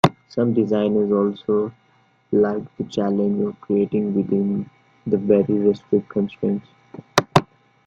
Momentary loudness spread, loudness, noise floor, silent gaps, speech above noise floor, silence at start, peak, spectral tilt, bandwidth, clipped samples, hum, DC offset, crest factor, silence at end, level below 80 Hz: 7 LU; -21 LUFS; -59 dBFS; none; 39 dB; 0.05 s; 0 dBFS; -6.5 dB/octave; 12 kHz; under 0.1%; none; under 0.1%; 20 dB; 0.45 s; -56 dBFS